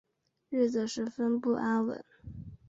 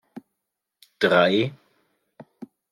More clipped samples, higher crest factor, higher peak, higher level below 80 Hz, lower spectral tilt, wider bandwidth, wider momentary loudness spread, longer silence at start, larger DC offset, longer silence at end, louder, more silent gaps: neither; about the same, 16 dB vs 20 dB; second, -16 dBFS vs -6 dBFS; first, -60 dBFS vs -72 dBFS; about the same, -5.5 dB/octave vs -6 dB/octave; second, 7.8 kHz vs 14 kHz; second, 17 LU vs 26 LU; first, 0.5 s vs 0.15 s; neither; about the same, 0.15 s vs 0.25 s; second, -31 LUFS vs -21 LUFS; neither